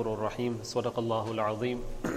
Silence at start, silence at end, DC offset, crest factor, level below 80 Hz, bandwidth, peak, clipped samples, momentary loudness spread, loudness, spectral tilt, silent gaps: 0 s; 0 s; under 0.1%; 16 dB; -46 dBFS; 15.5 kHz; -16 dBFS; under 0.1%; 3 LU; -32 LUFS; -6 dB/octave; none